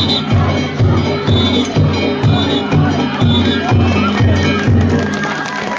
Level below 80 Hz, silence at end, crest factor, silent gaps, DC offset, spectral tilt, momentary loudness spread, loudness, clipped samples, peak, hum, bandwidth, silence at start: -26 dBFS; 0 s; 10 dB; none; under 0.1%; -6.5 dB/octave; 3 LU; -13 LUFS; under 0.1%; -2 dBFS; none; 7.6 kHz; 0 s